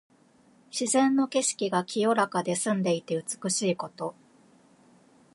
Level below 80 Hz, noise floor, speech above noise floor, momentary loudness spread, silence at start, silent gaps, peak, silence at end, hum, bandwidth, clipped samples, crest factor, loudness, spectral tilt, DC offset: -78 dBFS; -60 dBFS; 34 dB; 10 LU; 0.75 s; none; -10 dBFS; 1.25 s; none; 11.5 kHz; under 0.1%; 20 dB; -27 LUFS; -4 dB/octave; under 0.1%